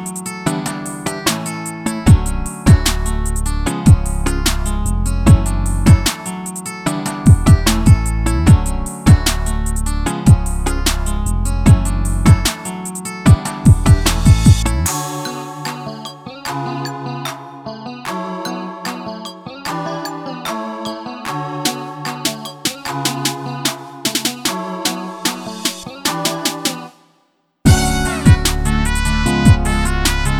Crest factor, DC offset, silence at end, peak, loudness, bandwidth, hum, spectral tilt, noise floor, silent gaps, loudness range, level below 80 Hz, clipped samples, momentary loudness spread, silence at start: 16 dB; under 0.1%; 0 s; 0 dBFS; -16 LUFS; 18 kHz; none; -5 dB/octave; -61 dBFS; none; 11 LU; -20 dBFS; under 0.1%; 13 LU; 0 s